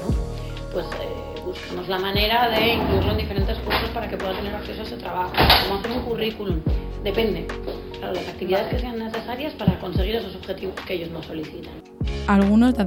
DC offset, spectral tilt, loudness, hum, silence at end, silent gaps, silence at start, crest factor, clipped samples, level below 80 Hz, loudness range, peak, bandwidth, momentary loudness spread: under 0.1%; -6.5 dB/octave; -24 LUFS; none; 0 s; none; 0 s; 22 dB; under 0.1%; -32 dBFS; 4 LU; -2 dBFS; 17 kHz; 14 LU